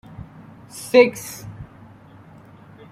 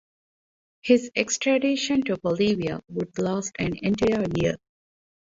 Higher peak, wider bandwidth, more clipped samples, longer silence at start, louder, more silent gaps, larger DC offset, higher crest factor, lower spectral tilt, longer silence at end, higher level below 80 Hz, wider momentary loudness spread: first, -2 dBFS vs -6 dBFS; first, 16 kHz vs 7.8 kHz; neither; about the same, 0.75 s vs 0.85 s; first, -16 LUFS vs -24 LUFS; neither; neither; about the same, 22 dB vs 18 dB; about the same, -4.5 dB/octave vs -4.5 dB/octave; first, 1.3 s vs 0.7 s; about the same, -54 dBFS vs -52 dBFS; first, 26 LU vs 8 LU